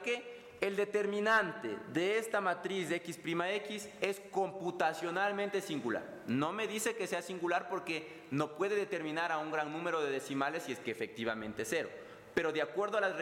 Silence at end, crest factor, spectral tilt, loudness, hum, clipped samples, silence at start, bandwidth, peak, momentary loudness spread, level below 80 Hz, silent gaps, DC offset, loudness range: 0 s; 18 dB; -4 dB/octave; -36 LUFS; none; under 0.1%; 0 s; 17 kHz; -18 dBFS; 6 LU; -76 dBFS; none; under 0.1%; 3 LU